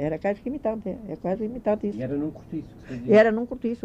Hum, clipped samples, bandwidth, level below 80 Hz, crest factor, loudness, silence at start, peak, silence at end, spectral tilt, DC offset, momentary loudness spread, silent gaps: none; under 0.1%; 8.2 kHz; -52 dBFS; 18 dB; -25 LUFS; 0 s; -6 dBFS; 0.05 s; -8 dB/octave; under 0.1%; 18 LU; none